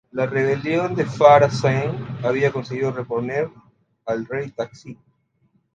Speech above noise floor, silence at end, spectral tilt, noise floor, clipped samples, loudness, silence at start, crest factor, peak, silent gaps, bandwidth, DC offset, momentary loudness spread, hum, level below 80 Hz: 45 dB; 0.8 s; -7 dB/octave; -65 dBFS; under 0.1%; -20 LUFS; 0.15 s; 20 dB; 0 dBFS; none; 9 kHz; under 0.1%; 16 LU; none; -58 dBFS